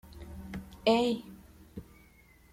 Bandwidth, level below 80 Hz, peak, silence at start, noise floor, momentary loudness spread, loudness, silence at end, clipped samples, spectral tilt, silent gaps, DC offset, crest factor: 16 kHz; -54 dBFS; -12 dBFS; 0.05 s; -60 dBFS; 23 LU; -30 LUFS; 0.7 s; under 0.1%; -5.5 dB/octave; none; under 0.1%; 22 dB